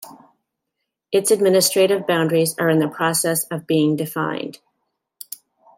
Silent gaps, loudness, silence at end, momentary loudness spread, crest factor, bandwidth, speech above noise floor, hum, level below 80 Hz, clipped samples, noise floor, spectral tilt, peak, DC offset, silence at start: none; -19 LUFS; 1.25 s; 18 LU; 16 dB; 16.5 kHz; 61 dB; none; -68 dBFS; under 0.1%; -79 dBFS; -4 dB/octave; -4 dBFS; under 0.1%; 0 s